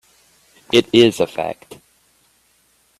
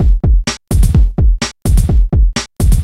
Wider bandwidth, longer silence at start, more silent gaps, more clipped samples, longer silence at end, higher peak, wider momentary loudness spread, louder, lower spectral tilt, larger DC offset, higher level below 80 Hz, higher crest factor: about the same, 13.5 kHz vs 14.5 kHz; first, 0.75 s vs 0 s; neither; neither; first, 1.45 s vs 0 s; about the same, 0 dBFS vs 0 dBFS; first, 15 LU vs 4 LU; about the same, -16 LUFS vs -14 LUFS; about the same, -4.5 dB/octave vs -5.5 dB/octave; neither; second, -58 dBFS vs -12 dBFS; first, 20 dB vs 10 dB